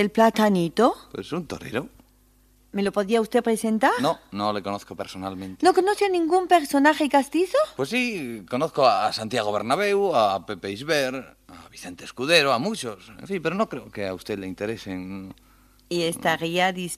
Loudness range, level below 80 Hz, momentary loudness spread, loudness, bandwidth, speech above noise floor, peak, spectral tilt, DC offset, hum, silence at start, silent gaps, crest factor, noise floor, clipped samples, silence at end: 6 LU; -60 dBFS; 14 LU; -23 LUFS; 15 kHz; 35 dB; -4 dBFS; -4.5 dB/octave; under 0.1%; none; 0 s; none; 20 dB; -58 dBFS; under 0.1%; 0 s